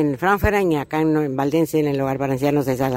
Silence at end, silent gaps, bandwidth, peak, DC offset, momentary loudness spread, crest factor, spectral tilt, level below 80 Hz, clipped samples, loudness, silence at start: 0 s; none; 16 kHz; -4 dBFS; under 0.1%; 3 LU; 16 dB; -7 dB/octave; -38 dBFS; under 0.1%; -20 LUFS; 0 s